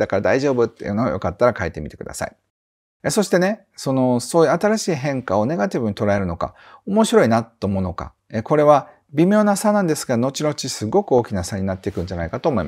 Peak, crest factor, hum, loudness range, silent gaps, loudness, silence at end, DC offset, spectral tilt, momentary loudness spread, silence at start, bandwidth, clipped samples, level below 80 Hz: 0 dBFS; 20 dB; none; 4 LU; 2.50-3.00 s; -20 LUFS; 0 s; under 0.1%; -5.5 dB/octave; 12 LU; 0 s; 16 kHz; under 0.1%; -46 dBFS